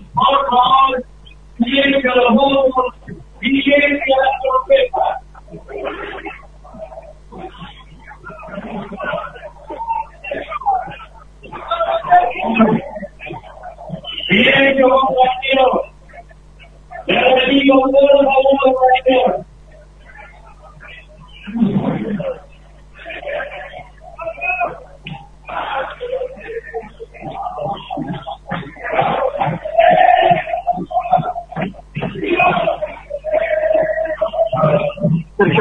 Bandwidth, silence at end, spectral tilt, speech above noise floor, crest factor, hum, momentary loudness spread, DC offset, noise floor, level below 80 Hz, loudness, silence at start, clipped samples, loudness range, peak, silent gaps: 4.1 kHz; 0 s; -7.5 dB/octave; 28 dB; 16 dB; none; 22 LU; under 0.1%; -41 dBFS; -42 dBFS; -15 LUFS; 0 s; under 0.1%; 12 LU; 0 dBFS; none